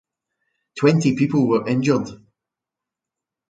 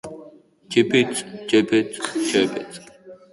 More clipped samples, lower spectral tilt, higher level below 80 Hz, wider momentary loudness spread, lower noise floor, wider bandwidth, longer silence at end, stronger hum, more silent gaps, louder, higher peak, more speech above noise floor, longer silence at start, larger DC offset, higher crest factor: neither; first, -7 dB/octave vs -4 dB/octave; about the same, -62 dBFS vs -62 dBFS; second, 10 LU vs 20 LU; first, -86 dBFS vs -47 dBFS; second, 9.2 kHz vs 11.5 kHz; first, 1.35 s vs 0.2 s; neither; neither; about the same, -19 LUFS vs -21 LUFS; about the same, -4 dBFS vs -4 dBFS; first, 68 dB vs 26 dB; first, 0.75 s vs 0.05 s; neither; about the same, 18 dB vs 18 dB